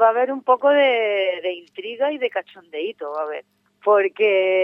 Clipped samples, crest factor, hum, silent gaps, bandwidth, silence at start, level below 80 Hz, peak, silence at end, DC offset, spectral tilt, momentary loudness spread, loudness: under 0.1%; 16 dB; 50 Hz at -70 dBFS; none; 4 kHz; 0 s; -88 dBFS; -4 dBFS; 0 s; under 0.1%; -5 dB/octave; 13 LU; -20 LUFS